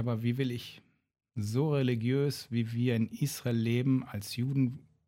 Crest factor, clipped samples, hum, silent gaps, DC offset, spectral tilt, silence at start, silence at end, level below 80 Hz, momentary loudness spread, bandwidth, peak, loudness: 16 dB; under 0.1%; none; none; under 0.1%; -7 dB/octave; 0 s; 0.3 s; -68 dBFS; 8 LU; 16.5 kHz; -16 dBFS; -32 LUFS